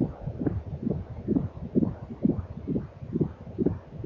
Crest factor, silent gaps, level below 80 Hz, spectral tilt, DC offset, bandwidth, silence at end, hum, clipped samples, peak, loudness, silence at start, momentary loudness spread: 20 dB; none; -44 dBFS; -12 dB/octave; under 0.1%; 5.4 kHz; 0 s; none; under 0.1%; -10 dBFS; -31 LUFS; 0 s; 5 LU